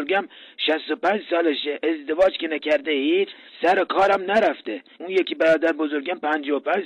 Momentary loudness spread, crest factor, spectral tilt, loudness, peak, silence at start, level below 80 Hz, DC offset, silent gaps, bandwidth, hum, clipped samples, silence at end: 7 LU; 12 dB; -4.5 dB/octave; -22 LUFS; -10 dBFS; 0 s; -62 dBFS; under 0.1%; none; 10.5 kHz; none; under 0.1%; 0 s